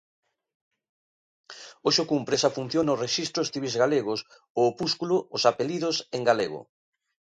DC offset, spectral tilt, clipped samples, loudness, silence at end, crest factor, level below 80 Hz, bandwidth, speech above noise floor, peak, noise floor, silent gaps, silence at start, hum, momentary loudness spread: under 0.1%; -4 dB/octave; under 0.1%; -26 LUFS; 0.75 s; 22 dB; -70 dBFS; 10.5 kHz; over 64 dB; -6 dBFS; under -90 dBFS; 4.50-4.55 s; 1.5 s; none; 8 LU